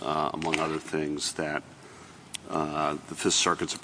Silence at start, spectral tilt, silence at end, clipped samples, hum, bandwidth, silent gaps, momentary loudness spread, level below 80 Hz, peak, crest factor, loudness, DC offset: 0 s; -2.5 dB/octave; 0 s; under 0.1%; none; 10.5 kHz; none; 21 LU; -60 dBFS; -8 dBFS; 24 dB; -28 LUFS; under 0.1%